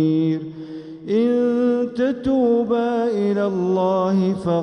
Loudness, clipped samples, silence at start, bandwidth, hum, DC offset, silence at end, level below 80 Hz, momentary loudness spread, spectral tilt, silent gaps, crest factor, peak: -20 LUFS; under 0.1%; 0 s; 9.4 kHz; none; under 0.1%; 0 s; -54 dBFS; 8 LU; -8.5 dB/octave; none; 12 dB; -8 dBFS